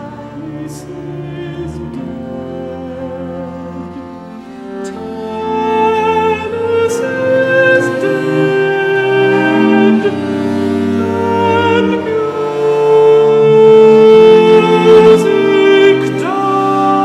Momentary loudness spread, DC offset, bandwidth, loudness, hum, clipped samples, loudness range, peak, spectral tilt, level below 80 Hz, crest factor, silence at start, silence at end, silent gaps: 20 LU; under 0.1%; 11.5 kHz; -10 LUFS; none; under 0.1%; 17 LU; 0 dBFS; -6.5 dB/octave; -48 dBFS; 10 dB; 0 s; 0 s; none